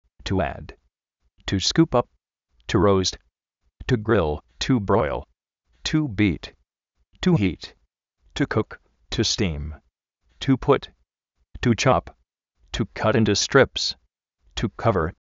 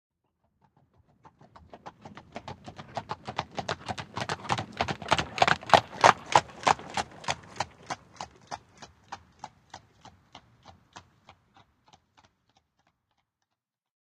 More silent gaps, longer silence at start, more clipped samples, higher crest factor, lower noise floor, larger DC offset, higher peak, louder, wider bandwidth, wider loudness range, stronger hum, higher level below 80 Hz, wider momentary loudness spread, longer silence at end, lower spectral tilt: neither; second, 0.25 s vs 1.75 s; neither; second, 22 dB vs 32 dB; second, -73 dBFS vs -87 dBFS; neither; second, -4 dBFS vs 0 dBFS; first, -23 LUFS vs -28 LUFS; second, 8 kHz vs 13 kHz; second, 4 LU vs 21 LU; neither; first, -42 dBFS vs -62 dBFS; second, 16 LU vs 27 LU; second, 0.1 s vs 3 s; first, -4.5 dB/octave vs -3 dB/octave